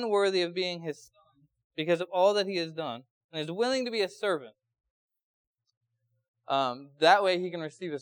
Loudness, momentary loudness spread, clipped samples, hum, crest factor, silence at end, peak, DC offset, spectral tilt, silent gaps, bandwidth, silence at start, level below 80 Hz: -29 LUFS; 14 LU; under 0.1%; none; 22 dB; 0 s; -8 dBFS; under 0.1%; -4.5 dB/octave; 1.64-1.70 s, 3.10-3.29 s, 4.90-5.09 s, 5.23-5.54 s, 5.77-5.81 s, 6.28-6.34 s; 19 kHz; 0 s; -86 dBFS